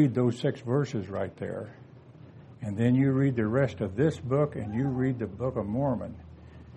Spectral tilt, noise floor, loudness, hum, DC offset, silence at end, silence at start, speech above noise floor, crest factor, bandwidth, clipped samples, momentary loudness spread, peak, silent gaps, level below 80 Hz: -8.5 dB/octave; -50 dBFS; -29 LUFS; none; under 0.1%; 0 s; 0 s; 23 dB; 16 dB; 8.8 kHz; under 0.1%; 15 LU; -12 dBFS; none; -56 dBFS